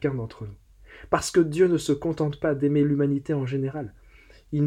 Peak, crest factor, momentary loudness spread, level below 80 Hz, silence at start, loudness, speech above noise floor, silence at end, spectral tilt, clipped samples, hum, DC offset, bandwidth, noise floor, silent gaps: -6 dBFS; 20 dB; 15 LU; -52 dBFS; 0 s; -24 LUFS; 28 dB; 0 s; -6.5 dB/octave; under 0.1%; none; under 0.1%; 13.5 kHz; -52 dBFS; none